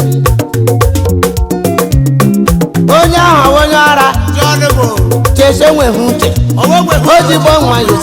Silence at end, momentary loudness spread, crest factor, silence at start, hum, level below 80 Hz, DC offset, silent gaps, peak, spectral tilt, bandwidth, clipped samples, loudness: 0 s; 5 LU; 8 dB; 0 s; none; -20 dBFS; under 0.1%; none; 0 dBFS; -5.5 dB/octave; over 20 kHz; 0.9%; -8 LUFS